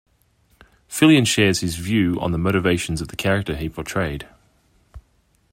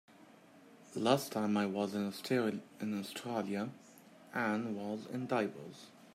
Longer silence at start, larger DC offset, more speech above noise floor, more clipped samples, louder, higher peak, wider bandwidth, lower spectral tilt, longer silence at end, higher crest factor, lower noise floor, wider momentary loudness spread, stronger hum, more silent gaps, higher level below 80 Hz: first, 0.9 s vs 0.2 s; neither; first, 42 dB vs 24 dB; neither; first, -20 LUFS vs -37 LUFS; first, -2 dBFS vs -14 dBFS; about the same, 16 kHz vs 16 kHz; about the same, -5 dB/octave vs -5.5 dB/octave; first, 0.55 s vs 0.05 s; about the same, 18 dB vs 22 dB; about the same, -62 dBFS vs -60 dBFS; about the same, 13 LU vs 12 LU; neither; neither; first, -44 dBFS vs -84 dBFS